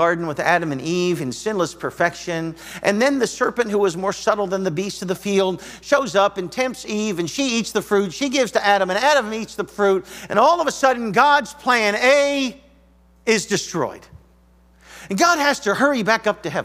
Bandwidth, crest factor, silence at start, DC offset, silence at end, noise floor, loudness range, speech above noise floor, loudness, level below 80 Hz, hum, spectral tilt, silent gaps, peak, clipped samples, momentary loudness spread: 16 kHz; 20 dB; 0 s; under 0.1%; 0 s; -53 dBFS; 4 LU; 34 dB; -19 LUFS; -56 dBFS; none; -4 dB/octave; none; 0 dBFS; under 0.1%; 10 LU